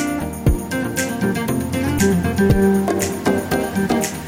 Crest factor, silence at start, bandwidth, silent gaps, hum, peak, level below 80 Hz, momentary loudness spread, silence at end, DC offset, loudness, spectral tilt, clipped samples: 14 dB; 0 s; 17 kHz; none; none; -4 dBFS; -30 dBFS; 6 LU; 0 s; under 0.1%; -19 LUFS; -5.5 dB/octave; under 0.1%